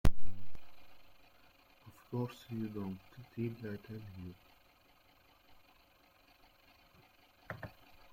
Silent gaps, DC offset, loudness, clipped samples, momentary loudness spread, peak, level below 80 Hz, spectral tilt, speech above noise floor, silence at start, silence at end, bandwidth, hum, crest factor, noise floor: none; under 0.1%; -45 LUFS; under 0.1%; 24 LU; -14 dBFS; -48 dBFS; -7 dB/octave; 24 dB; 0.05 s; 0.45 s; 16.5 kHz; none; 20 dB; -67 dBFS